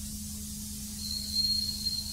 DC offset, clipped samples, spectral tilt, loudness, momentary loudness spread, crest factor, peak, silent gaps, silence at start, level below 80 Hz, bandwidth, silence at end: under 0.1%; under 0.1%; -2 dB/octave; -31 LUFS; 11 LU; 14 dB; -20 dBFS; none; 0 s; -48 dBFS; 16 kHz; 0 s